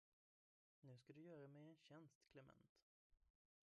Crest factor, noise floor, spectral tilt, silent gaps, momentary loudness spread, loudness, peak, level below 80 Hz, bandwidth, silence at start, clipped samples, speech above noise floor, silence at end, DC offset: 16 dB; under -90 dBFS; -6.5 dB/octave; 2.15-2.21 s, 2.69-2.75 s, 2.82-3.10 s; 7 LU; -66 LUFS; -52 dBFS; under -90 dBFS; 7.2 kHz; 0.8 s; under 0.1%; over 25 dB; 0.5 s; under 0.1%